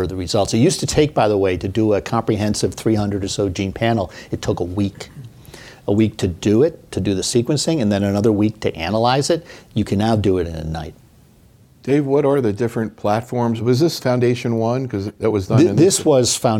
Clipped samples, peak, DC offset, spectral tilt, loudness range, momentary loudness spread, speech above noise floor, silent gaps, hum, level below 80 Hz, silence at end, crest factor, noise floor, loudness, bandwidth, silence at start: under 0.1%; -2 dBFS; under 0.1%; -5.5 dB/octave; 3 LU; 9 LU; 32 dB; none; none; -42 dBFS; 0 s; 16 dB; -49 dBFS; -18 LUFS; 16.5 kHz; 0 s